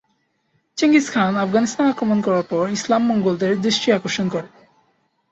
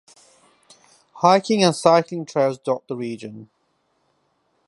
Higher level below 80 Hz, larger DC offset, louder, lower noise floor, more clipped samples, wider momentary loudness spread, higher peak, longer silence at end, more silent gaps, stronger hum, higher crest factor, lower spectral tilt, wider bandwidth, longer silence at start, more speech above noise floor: first, -60 dBFS vs -70 dBFS; neither; about the same, -19 LUFS vs -20 LUFS; about the same, -67 dBFS vs -68 dBFS; neither; second, 6 LU vs 14 LU; second, -4 dBFS vs 0 dBFS; second, 0.85 s vs 1.25 s; neither; neither; second, 16 dB vs 22 dB; about the same, -5 dB/octave vs -5 dB/octave; second, 8.2 kHz vs 11.5 kHz; second, 0.75 s vs 1.15 s; about the same, 49 dB vs 48 dB